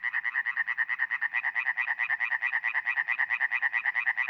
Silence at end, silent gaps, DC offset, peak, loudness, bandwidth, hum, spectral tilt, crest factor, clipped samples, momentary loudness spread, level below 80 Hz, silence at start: 0 s; none; under 0.1%; -14 dBFS; -27 LUFS; 6.2 kHz; none; 0 dB/octave; 16 dB; under 0.1%; 2 LU; under -90 dBFS; 0 s